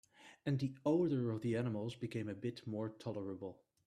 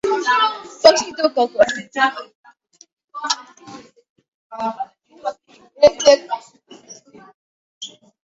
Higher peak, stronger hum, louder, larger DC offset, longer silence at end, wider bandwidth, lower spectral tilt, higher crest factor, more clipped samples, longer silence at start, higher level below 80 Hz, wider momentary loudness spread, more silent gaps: second, -24 dBFS vs 0 dBFS; neither; second, -40 LUFS vs -18 LUFS; neither; about the same, 0.35 s vs 0.4 s; first, 11.5 kHz vs 8 kHz; first, -8 dB/octave vs -1.5 dB/octave; about the same, 16 dB vs 20 dB; neither; first, 0.2 s vs 0.05 s; second, -76 dBFS vs -60 dBFS; second, 11 LU vs 22 LU; second, none vs 2.35-2.44 s, 2.93-2.97 s, 3.04-3.08 s, 4.09-4.16 s, 4.28-4.50 s, 7.34-7.81 s